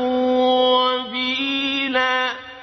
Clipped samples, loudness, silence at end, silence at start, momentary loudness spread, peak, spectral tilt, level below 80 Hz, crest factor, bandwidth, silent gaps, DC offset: under 0.1%; -19 LUFS; 0 s; 0 s; 6 LU; -6 dBFS; -3 dB/octave; -60 dBFS; 14 dB; 6.2 kHz; none; under 0.1%